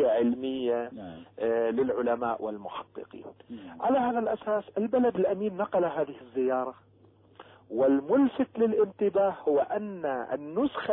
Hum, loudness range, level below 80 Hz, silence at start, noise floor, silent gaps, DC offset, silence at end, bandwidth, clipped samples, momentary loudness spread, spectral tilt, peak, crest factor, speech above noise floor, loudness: none; 4 LU; -68 dBFS; 0 s; -59 dBFS; none; under 0.1%; 0 s; 4 kHz; under 0.1%; 15 LU; -10.5 dB/octave; -14 dBFS; 14 dB; 31 dB; -28 LUFS